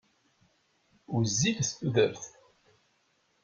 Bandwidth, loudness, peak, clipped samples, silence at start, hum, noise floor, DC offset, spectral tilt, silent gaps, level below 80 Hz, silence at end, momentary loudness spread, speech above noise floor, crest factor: 9.4 kHz; -29 LUFS; -10 dBFS; under 0.1%; 1.1 s; none; -72 dBFS; under 0.1%; -4 dB/octave; none; -64 dBFS; 1.15 s; 14 LU; 43 dB; 22 dB